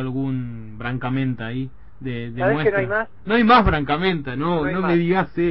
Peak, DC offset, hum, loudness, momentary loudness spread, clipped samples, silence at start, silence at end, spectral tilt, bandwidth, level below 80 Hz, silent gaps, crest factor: -4 dBFS; 1%; none; -21 LUFS; 15 LU; under 0.1%; 0 s; 0 s; -10 dB/octave; 5.8 kHz; -38 dBFS; none; 16 dB